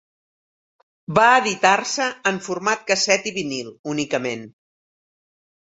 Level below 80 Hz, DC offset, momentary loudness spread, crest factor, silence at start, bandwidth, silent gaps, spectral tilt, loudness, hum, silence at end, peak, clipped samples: -64 dBFS; under 0.1%; 13 LU; 22 dB; 1.1 s; 8.2 kHz; 3.79-3.84 s; -2.5 dB/octave; -20 LUFS; none; 1.3 s; -2 dBFS; under 0.1%